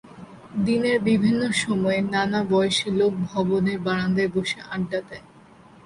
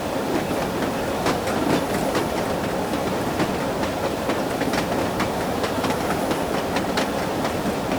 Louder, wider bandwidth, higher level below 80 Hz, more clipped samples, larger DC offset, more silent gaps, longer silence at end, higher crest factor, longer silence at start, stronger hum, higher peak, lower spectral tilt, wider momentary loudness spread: about the same, -23 LUFS vs -23 LUFS; second, 11.5 kHz vs over 20 kHz; second, -54 dBFS vs -44 dBFS; neither; neither; neither; first, 0.65 s vs 0 s; about the same, 14 dB vs 14 dB; about the same, 0.05 s vs 0 s; neither; about the same, -8 dBFS vs -8 dBFS; about the same, -5.5 dB/octave vs -5 dB/octave; first, 8 LU vs 2 LU